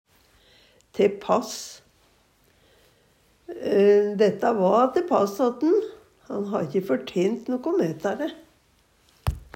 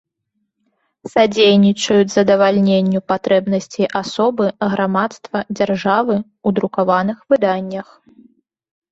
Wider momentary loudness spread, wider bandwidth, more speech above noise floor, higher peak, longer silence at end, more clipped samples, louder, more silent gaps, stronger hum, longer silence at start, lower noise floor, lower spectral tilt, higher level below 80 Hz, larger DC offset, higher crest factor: first, 14 LU vs 8 LU; first, 16 kHz vs 8 kHz; second, 40 dB vs 56 dB; second, -8 dBFS vs 0 dBFS; second, 0.1 s vs 1.1 s; neither; second, -24 LUFS vs -16 LUFS; neither; neither; about the same, 0.95 s vs 1.05 s; second, -62 dBFS vs -72 dBFS; about the same, -6 dB/octave vs -5.5 dB/octave; first, -48 dBFS vs -58 dBFS; neither; about the same, 18 dB vs 16 dB